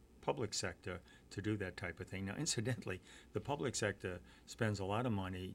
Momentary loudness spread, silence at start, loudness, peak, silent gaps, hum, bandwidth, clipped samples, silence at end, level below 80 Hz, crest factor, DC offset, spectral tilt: 11 LU; 0 s; -42 LUFS; -22 dBFS; none; none; 16 kHz; under 0.1%; 0 s; -66 dBFS; 20 dB; under 0.1%; -4.5 dB/octave